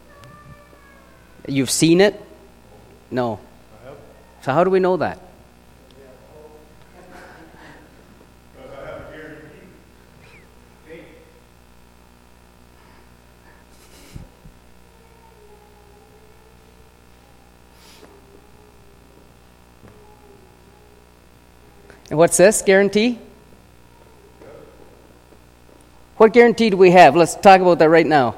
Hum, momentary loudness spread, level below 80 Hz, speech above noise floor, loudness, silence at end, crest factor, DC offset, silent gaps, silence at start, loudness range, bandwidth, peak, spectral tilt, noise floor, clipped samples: 60 Hz at -50 dBFS; 26 LU; -52 dBFS; 36 dB; -14 LUFS; 0.05 s; 20 dB; under 0.1%; none; 1.45 s; 26 LU; 16.5 kHz; 0 dBFS; -4.5 dB/octave; -49 dBFS; under 0.1%